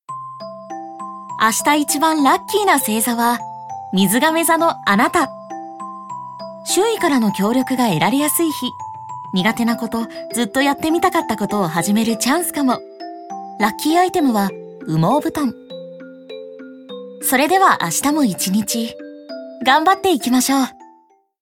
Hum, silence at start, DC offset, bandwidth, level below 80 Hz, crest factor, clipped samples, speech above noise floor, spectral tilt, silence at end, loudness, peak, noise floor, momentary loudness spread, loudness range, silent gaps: none; 0.1 s; under 0.1%; 19 kHz; -58 dBFS; 18 dB; under 0.1%; 37 dB; -3.5 dB/octave; 0.55 s; -17 LUFS; 0 dBFS; -54 dBFS; 18 LU; 3 LU; none